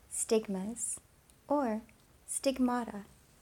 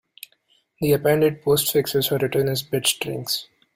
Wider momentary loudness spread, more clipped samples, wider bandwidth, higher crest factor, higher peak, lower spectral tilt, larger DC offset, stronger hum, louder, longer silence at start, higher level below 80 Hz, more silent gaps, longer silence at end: first, 12 LU vs 7 LU; neither; first, 19 kHz vs 16 kHz; about the same, 18 dB vs 16 dB; second, -18 dBFS vs -6 dBFS; about the same, -4 dB/octave vs -4 dB/octave; neither; neither; second, -34 LUFS vs -21 LUFS; second, 0.1 s vs 0.8 s; second, -66 dBFS vs -56 dBFS; neither; about the same, 0.35 s vs 0.3 s